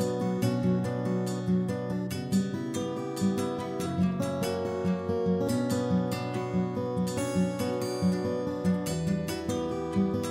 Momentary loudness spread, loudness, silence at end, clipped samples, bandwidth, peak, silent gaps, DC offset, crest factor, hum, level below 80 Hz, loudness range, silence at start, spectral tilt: 4 LU; -30 LUFS; 0 s; under 0.1%; 16 kHz; -14 dBFS; none; under 0.1%; 14 dB; none; -56 dBFS; 1 LU; 0 s; -6.5 dB/octave